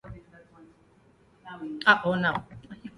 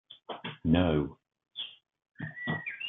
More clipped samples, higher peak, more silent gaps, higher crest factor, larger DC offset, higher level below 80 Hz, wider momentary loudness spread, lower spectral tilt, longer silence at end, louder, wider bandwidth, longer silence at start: neither; first, -4 dBFS vs -12 dBFS; second, none vs 2.11-2.15 s; about the same, 26 dB vs 22 dB; neither; second, -60 dBFS vs -54 dBFS; first, 25 LU vs 17 LU; second, -6 dB/octave vs -10 dB/octave; about the same, 0.05 s vs 0 s; first, -24 LUFS vs -32 LUFS; first, 11.5 kHz vs 3.9 kHz; about the same, 0.05 s vs 0.1 s